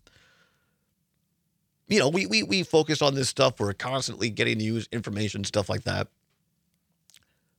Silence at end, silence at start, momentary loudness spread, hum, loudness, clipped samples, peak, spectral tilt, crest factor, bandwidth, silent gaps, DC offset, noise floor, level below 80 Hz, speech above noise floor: 1.5 s; 1.9 s; 8 LU; none; -26 LUFS; under 0.1%; -4 dBFS; -4 dB/octave; 24 dB; 16.5 kHz; none; under 0.1%; -74 dBFS; -64 dBFS; 49 dB